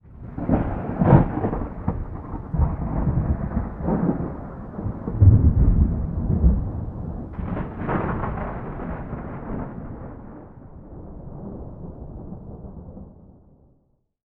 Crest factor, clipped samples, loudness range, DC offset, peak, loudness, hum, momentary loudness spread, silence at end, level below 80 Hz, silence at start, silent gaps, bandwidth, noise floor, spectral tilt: 22 dB; under 0.1%; 18 LU; under 0.1%; -2 dBFS; -24 LUFS; none; 22 LU; 0.95 s; -28 dBFS; 0.05 s; none; 3.3 kHz; -65 dBFS; -13 dB/octave